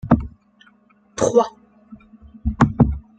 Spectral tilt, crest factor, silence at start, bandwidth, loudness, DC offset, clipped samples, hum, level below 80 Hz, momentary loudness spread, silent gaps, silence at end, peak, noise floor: -7 dB/octave; 22 dB; 0.05 s; 9.2 kHz; -20 LUFS; under 0.1%; under 0.1%; none; -34 dBFS; 15 LU; none; 0.2 s; 0 dBFS; -55 dBFS